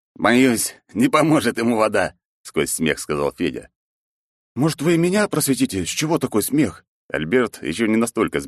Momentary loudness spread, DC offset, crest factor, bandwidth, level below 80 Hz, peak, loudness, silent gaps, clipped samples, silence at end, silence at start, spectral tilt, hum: 9 LU; under 0.1%; 18 dB; 13 kHz; -52 dBFS; -4 dBFS; -20 LUFS; 2.25-2.44 s, 3.75-4.55 s, 6.88-7.09 s; under 0.1%; 0 s; 0.2 s; -4.5 dB/octave; none